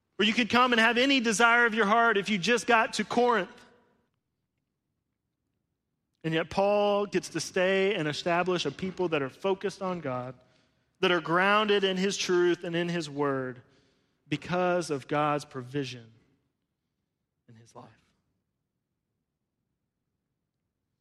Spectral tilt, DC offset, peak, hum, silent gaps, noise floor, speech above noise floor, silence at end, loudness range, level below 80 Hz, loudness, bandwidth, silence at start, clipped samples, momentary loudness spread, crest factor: -4 dB/octave; under 0.1%; -8 dBFS; none; none; -83 dBFS; 56 dB; 3.15 s; 11 LU; -68 dBFS; -27 LUFS; 13.5 kHz; 0.2 s; under 0.1%; 13 LU; 20 dB